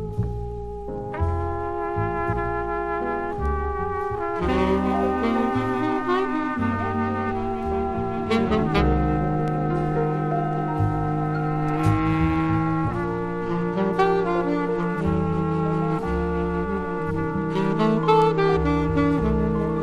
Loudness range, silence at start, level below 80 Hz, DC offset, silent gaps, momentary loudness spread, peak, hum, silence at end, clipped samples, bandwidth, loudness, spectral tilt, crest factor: 3 LU; 0 s; -34 dBFS; under 0.1%; none; 6 LU; -6 dBFS; none; 0 s; under 0.1%; 10 kHz; -24 LUFS; -8.5 dB/octave; 16 dB